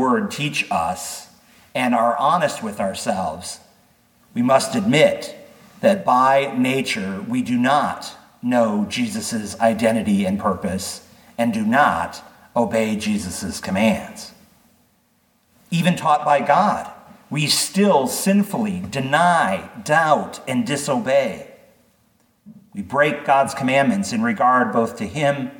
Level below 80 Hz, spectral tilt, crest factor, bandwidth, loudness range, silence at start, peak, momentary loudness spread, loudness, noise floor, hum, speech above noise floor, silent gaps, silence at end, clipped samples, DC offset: -58 dBFS; -4.5 dB/octave; 18 dB; 19 kHz; 4 LU; 0 s; -2 dBFS; 13 LU; -19 LUFS; -62 dBFS; none; 43 dB; none; 0.05 s; under 0.1%; under 0.1%